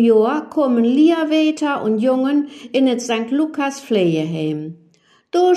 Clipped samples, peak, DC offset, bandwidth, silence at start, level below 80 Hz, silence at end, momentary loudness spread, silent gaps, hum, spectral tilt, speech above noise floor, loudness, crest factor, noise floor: under 0.1%; -4 dBFS; under 0.1%; 12 kHz; 0 s; -70 dBFS; 0 s; 9 LU; none; none; -6 dB/octave; 34 dB; -18 LUFS; 14 dB; -50 dBFS